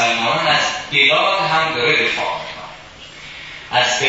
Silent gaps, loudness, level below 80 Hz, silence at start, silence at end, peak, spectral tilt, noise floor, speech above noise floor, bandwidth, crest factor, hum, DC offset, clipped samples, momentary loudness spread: none; -15 LUFS; -52 dBFS; 0 s; 0 s; 0 dBFS; -2 dB/octave; -38 dBFS; 22 dB; 8 kHz; 18 dB; none; under 0.1%; under 0.1%; 21 LU